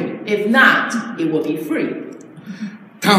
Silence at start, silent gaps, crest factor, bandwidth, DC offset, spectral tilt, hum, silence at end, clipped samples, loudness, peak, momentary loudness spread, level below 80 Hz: 0 s; none; 18 dB; 16 kHz; under 0.1%; -4.5 dB/octave; none; 0 s; under 0.1%; -17 LUFS; 0 dBFS; 21 LU; -74 dBFS